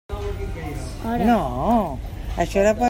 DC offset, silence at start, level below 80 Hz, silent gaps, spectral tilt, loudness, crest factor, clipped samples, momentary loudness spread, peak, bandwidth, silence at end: under 0.1%; 0.1 s; -32 dBFS; none; -6.5 dB/octave; -23 LUFS; 16 dB; under 0.1%; 12 LU; -6 dBFS; 16.5 kHz; 0 s